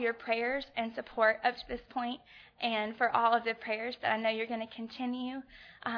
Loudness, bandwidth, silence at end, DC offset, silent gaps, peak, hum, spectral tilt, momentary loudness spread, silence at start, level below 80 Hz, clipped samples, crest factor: -33 LUFS; 5.4 kHz; 0 s; under 0.1%; none; -14 dBFS; none; -6 dB/octave; 13 LU; 0 s; -66 dBFS; under 0.1%; 20 dB